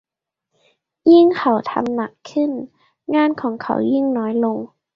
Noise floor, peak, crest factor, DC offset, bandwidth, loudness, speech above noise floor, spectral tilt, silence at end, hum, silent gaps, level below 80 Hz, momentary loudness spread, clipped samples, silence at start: -81 dBFS; -2 dBFS; 16 dB; under 0.1%; 7 kHz; -18 LUFS; 65 dB; -7 dB/octave; 0.3 s; none; none; -64 dBFS; 14 LU; under 0.1%; 1.05 s